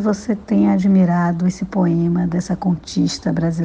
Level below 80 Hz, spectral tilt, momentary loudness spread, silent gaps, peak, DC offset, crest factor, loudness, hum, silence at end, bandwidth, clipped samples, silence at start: -44 dBFS; -7 dB/octave; 6 LU; none; -4 dBFS; under 0.1%; 12 dB; -18 LUFS; none; 0 s; 8.8 kHz; under 0.1%; 0 s